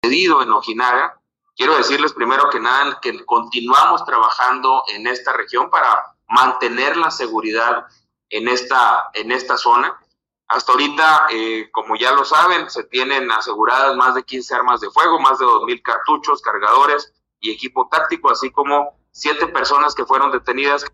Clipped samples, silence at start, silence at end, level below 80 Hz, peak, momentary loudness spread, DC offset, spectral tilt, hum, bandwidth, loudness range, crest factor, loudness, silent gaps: under 0.1%; 0.05 s; 0.05 s; -62 dBFS; -2 dBFS; 9 LU; under 0.1%; -2 dB/octave; none; 15 kHz; 2 LU; 14 dB; -16 LUFS; none